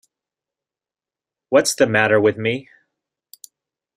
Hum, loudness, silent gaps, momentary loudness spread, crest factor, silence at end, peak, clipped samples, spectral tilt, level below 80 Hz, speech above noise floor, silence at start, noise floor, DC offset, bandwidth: none; -17 LUFS; none; 9 LU; 20 dB; 1.35 s; -2 dBFS; under 0.1%; -4 dB/octave; -62 dBFS; over 73 dB; 1.5 s; under -90 dBFS; under 0.1%; 16 kHz